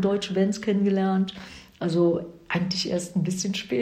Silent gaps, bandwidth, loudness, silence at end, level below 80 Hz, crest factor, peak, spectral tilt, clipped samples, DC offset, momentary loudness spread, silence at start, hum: none; 12.5 kHz; -25 LUFS; 0 s; -60 dBFS; 16 dB; -10 dBFS; -5.5 dB/octave; under 0.1%; under 0.1%; 8 LU; 0 s; none